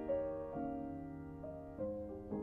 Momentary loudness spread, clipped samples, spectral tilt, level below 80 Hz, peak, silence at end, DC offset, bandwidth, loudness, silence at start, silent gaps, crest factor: 9 LU; under 0.1%; -10.5 dB/octave; -60 dBFS; -28 dBFS; 0 s; under 0.1%; 3.4 kHz; -44 LUFS; 0 s; none; 14 dB